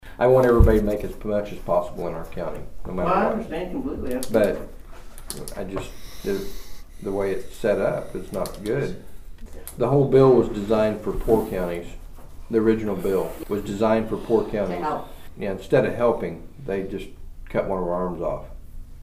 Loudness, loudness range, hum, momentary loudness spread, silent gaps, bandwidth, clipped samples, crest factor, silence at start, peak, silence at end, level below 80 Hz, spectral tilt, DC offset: -24 LUFS; 7 LU; none; 17 LU; none; 15.5 kHz; under 0.1%; 20 dB; 0 s; -2 dBFS; 0 s; -34 dBFS; -7 dB/octave; under 0.1%